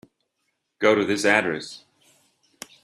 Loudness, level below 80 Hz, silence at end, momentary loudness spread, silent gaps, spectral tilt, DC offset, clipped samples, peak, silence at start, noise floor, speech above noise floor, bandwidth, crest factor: -21 LUFS; -70 dBFS; 1.05 s; 23 LU; none; -4 dB/octave; under 0.1%; under 0.1%; -2 dBFS; 0.8 s; -76 dBFS; 54 dB; 13.5 kHz; 22 dB